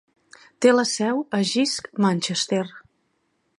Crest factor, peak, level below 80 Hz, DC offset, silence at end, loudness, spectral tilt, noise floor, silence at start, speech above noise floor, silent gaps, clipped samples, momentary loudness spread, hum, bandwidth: 20 dB; -4 dBFS; -70 dBFS; under 0.1%; 0.8 s; -22 LUFS; -4 dB/octave; -70 dBFS; 0.6 s; 49 dB; none; under 0.1%; 6 LU; none; 11.5 kHz